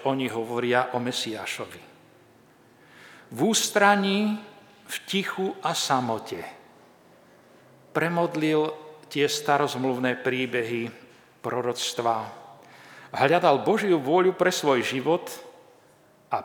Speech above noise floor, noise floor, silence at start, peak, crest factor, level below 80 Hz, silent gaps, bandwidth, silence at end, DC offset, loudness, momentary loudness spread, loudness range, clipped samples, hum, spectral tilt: 33 dB; -57 dBFS; 0 s; -2 dBFS; 24 dB; -78 dBFS; none; over 20 kHz; 0 s; under 0.1%; -25 LUFS; 16 LU; 6 LU; under 0.1%; none; -4 dB/octave